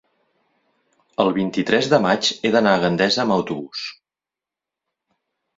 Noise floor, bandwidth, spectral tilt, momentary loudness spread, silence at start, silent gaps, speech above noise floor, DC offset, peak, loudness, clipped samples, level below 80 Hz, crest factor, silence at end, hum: -89 dBFS; 7.8 kHz; -4.5 dB/octave; 13 LU; 1.2 s; none; 70 dB; under 0.1%; -2 dBFS; -19 LUFS; under 0.1%; -60 dBFS; 20 dB; 1.65 s; none